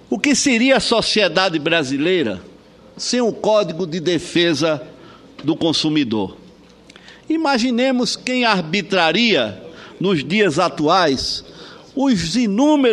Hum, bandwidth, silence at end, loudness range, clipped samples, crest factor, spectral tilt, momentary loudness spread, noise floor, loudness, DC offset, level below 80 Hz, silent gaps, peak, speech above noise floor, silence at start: none; 12 kHz; 0 s; 3 LU; under 0.1%; 18 dB; -4 dB/octave; 10 LU; -45 dBFS; -17 LUFS; under 0.1%; -50 dBFS; none; 0 dBFS; 28 dB; 0.1 s